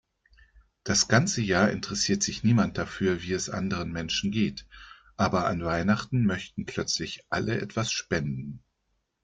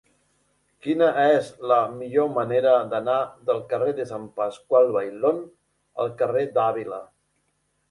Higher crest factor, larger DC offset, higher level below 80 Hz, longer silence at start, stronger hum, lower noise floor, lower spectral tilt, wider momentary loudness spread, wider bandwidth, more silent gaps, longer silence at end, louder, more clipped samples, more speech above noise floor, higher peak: about the same, 22 dB vs 18 dB; neither; first, -54 dBFS vs -68 dBFS; about the same, 0.85 s vs 0.85 s; neither; first, -77 dBFS vs -71 dBFS; second, -4.5 dB/octave vs -6.5 dB/octave; about the same, 10 LU vs 12 LU; second, 9.4 kHz vs 11 kHz; neither; second, 0.65 s vs 0.85 s; second, -27 LUFS vs -23 LUFS; neither; about the same, 49 dB vs 49 dB; about the same, -6 dBFS vs -6 dBFS